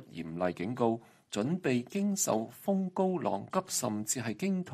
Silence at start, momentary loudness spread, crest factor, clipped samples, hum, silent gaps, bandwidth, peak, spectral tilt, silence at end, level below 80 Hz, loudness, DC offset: 0 s; 4 LU; 18 dB; under 0.1%; none; none; 15 kHz; -14 dBFS; -5 dB/octave; 0 s; -72 dBFS; -33 LUFS; under 0.1%